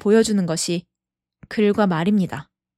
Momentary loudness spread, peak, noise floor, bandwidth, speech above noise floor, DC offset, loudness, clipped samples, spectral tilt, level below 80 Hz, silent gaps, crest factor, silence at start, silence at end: 11 LU; -4 dBFS; -86 dBFS; 13 kHz; 67 dB; under 0.1%; -20 LUFS; under 0.1%; -5.5 dB/octave; -56 dBFS; none; 16 dB; 0.05 s; 0.35 s